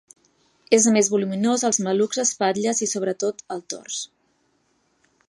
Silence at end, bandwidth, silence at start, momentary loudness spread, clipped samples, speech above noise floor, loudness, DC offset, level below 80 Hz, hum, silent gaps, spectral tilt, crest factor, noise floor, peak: 1.25 s; 11.5 kHz; 0.7 s; 14 LU; under 0.1%; 45 dB; -21 LUFS; under 0.1%; -74 dBFS; none; none; -3.5 dB/octave; 20 dB; -67 dBFS; -2 dBFS